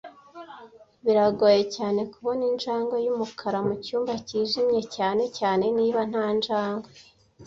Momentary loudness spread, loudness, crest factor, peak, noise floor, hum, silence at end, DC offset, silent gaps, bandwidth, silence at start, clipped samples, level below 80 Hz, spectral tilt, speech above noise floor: 10 LU; -25 LUFS; 18 dB; -8 dBFS; -45 dBFS; none; 0 s; under 0.1%; none; 7.8 kHz; 0.05 s; under 0.1%; -66 dBFS; -5.5 dB/octave; 20 dB